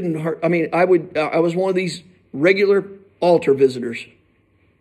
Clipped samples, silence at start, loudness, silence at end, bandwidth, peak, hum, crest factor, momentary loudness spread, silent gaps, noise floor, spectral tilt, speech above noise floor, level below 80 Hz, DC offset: under 0.1%; 0 s; -18 LUFS; 0.75 s; 11 kHz; -2 dBFS; none; 18 dB; 13 LU; none; -59 dBFS; -6.5 dB/octave; 41 dB; -66 dBFS; under 0.1%